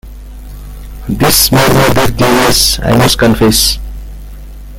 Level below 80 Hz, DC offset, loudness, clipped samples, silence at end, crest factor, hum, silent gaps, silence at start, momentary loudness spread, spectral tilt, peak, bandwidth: -24 dBFS; under 0.1%; -8 LUFS; 0.2%; 0 s; 10 dB; 50 Hz at -25 dBFS; none; 0.05 s; 22 LU; -3.5 dB/octave; 0 dBFS; over 20 kHz